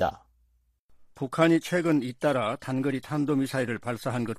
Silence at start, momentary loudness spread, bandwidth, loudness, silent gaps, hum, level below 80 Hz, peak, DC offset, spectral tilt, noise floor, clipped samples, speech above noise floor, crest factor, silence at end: 0 s; 8 LU; 15 kHz; -27 LUFS; 0.79-0.89 s; none; -60 dBFS; -8 dBFS; under 0.1%; -6.5 dB/octave; -68 dBFS; under 0.1%; 41 dB; 20 dB; 0 s